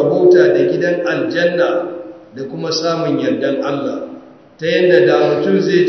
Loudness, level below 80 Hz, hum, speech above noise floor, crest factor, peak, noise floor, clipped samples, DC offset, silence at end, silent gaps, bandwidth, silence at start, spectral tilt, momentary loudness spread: -14 LUFS; -64 dBFS; none; 23 dB; 14 dB; 0 dBFS; -37 dBFS; under 0.1%; under 0.1%; 0 s; none; 6.4 kHz; 0 s; -6 dB/octave; 16 LU